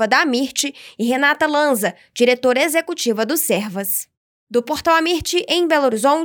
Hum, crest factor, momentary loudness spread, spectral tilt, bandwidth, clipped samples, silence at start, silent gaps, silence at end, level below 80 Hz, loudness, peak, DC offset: none; 14 dB; 7 LU; -2.5 dB/octave; over 20 kHz; under 0.1%; 0 s; 4.17-4.47 s; 0 s; -54 dBFS; -18 LUFS; -4 dBFS; under 0.1%